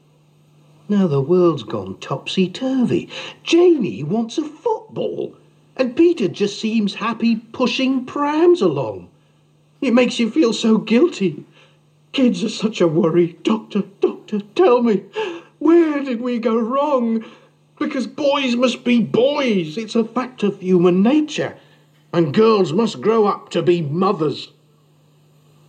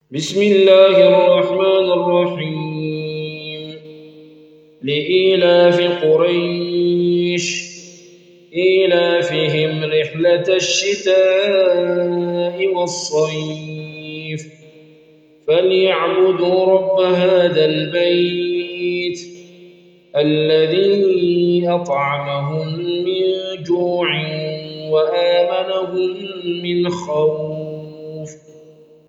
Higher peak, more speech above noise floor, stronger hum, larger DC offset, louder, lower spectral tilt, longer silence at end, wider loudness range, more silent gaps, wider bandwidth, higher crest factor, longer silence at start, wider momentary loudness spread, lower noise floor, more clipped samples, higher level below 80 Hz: second, -4 dBFS vs 0 dBFS; first, 38 dB vs 33 dB; neither; neither; about the same, -18 LUFS vs -16 LUFS; first, -6.5 dB/octave vs -5 dB/octave; first, 1.25 s vs 0.55 s; about the same, 3 LU vs 5 LU; neither; about the same, 9 kHz vs 8.2 kHz; about the same, 14 dB vs 16 dB; first, 0.9 s vs 0.1 s; second, 11 LU vs 15 LU; first, -55 dBFS vs -48 dBFS; neither; second, -72 dBFS vs -64 dBFS